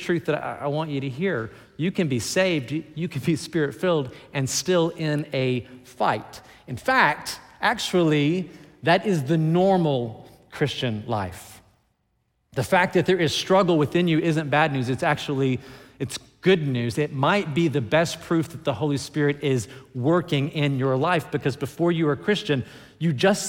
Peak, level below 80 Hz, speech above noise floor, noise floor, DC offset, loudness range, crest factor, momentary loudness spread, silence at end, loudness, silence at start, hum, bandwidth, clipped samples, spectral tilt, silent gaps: -4 dBFS; -60 dBFS; 48 dB; -71 dBFS; under 0.1%; 4 LU; 18 dB; 10 LU; 0 s; -23 LUFS; 0 s; none; 17 kHz; under 0.1%; -5.5 dB/octave; none